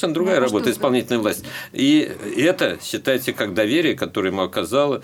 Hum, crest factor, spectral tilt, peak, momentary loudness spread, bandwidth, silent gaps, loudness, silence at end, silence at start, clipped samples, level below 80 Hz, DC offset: none; 16 dB; -4.5 dB/octave; -4 dBFS; 6 LU; 18 kHz; none; -20 LUFS; 0 s; 0 s; under 0.1%; -60 dBFS; under 0.1%